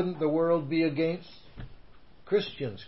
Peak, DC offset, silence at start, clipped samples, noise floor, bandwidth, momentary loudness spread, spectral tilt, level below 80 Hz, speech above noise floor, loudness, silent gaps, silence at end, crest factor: -16 dBFS; 0.3%; 0 s; under 0.1%; -55 dBFS; 5.8 kHz; 22 LU; -10.5 dB/octave; -56 dBFS; 27 dB; -29 LUFS; none; 0 s; 14 dB